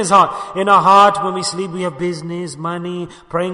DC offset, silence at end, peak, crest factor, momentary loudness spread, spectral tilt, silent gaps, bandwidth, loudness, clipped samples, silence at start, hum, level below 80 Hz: under 0.1%; 0 s; 0 dBFS; 16 dB; 15 LU; -4.5 dB/octave; none; 11 kHz; -15 LUFS; under 0.1%; 0 s; none; -56 dBFS